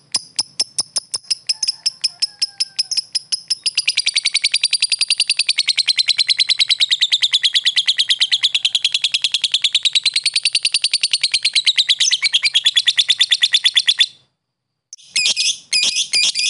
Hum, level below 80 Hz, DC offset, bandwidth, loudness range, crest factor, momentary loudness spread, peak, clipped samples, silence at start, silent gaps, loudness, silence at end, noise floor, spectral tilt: none; -72 dBFS; under 0.1%; 12 kHz; 5 LU; 16 dB; 7 LU; -2 dBFS; under 0.1%; 0.15 s; none; -14 LUFS; 0 s; -76 dBFS; 4.5 dB/octave